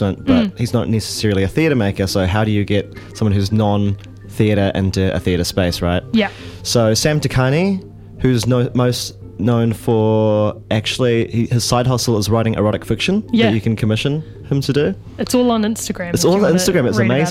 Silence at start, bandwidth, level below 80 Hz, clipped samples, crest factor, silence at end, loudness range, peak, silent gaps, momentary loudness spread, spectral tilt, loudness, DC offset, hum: 0 s; 16 kHz; -38 dBFS; under 0.1%; 16 dB; 0 s; 1 LU; 0 dBFS; none; 6 LU; -5.5 dB/octave; -17 LUFS; under 0.1%; none